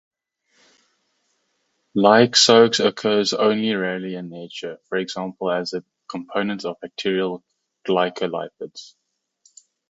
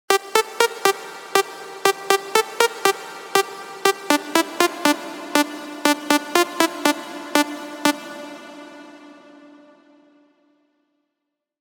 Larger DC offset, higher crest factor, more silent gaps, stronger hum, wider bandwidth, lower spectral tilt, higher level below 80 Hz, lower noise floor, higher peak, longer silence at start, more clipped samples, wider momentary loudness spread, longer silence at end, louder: neither; about the same, 22 dB vs 22 dB; neither; neither; second, 8 kHz vs over 20 kHz; first, -3.5 dB/octave vs -1.5 dB/octave; first, -68 dBFS vs -74 dBFS; second, -71 dBFS vs -80 dBFS; about the same, 0 dBFS vs -2 dBFS; first, 1.95 s vs 0.1 s; neither; first, 20 LU vs 12 LU; second, 1.05 s vs 2.5 s; about the same, -20 LUFS vs -21 LUFS